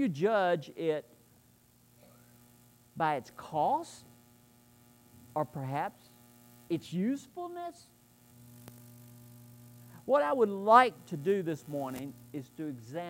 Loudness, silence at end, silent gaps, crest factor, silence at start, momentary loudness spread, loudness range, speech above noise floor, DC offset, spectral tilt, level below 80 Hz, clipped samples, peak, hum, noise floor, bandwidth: -32 LUFS; 0 s; none; 26 dB; 0 s; 25 LU; 11 LU; 33 dB; under 0.1%; -6 dB/octave; -76 dBFS; under 0.1%; -8 dBFS; 60 Hz at -65 dBFS; -64 dBFS; 16 kHz